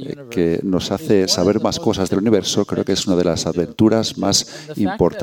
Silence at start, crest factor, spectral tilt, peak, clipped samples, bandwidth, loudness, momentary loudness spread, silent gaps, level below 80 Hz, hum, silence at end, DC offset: 0 s; 16 dB; -4.5 dB/octave; -2 dBFS; under 0.1%; 17.5 kHz; -18 LUFS; 5 LU; none; -46 dBFS; none; 0 s; under 0.1%